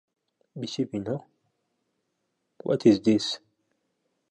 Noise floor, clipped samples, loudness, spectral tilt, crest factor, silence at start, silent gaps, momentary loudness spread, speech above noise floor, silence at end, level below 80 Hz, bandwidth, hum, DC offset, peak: -78 dBFS; under 0.1%; -26 LUFS; -6 dB/octave; 22 dB; 0.55 s; none; 17 LU; 53 dB; 0.95 s; -68 dBFS; 10 kHz; none; under 0.1%; -8 dBFS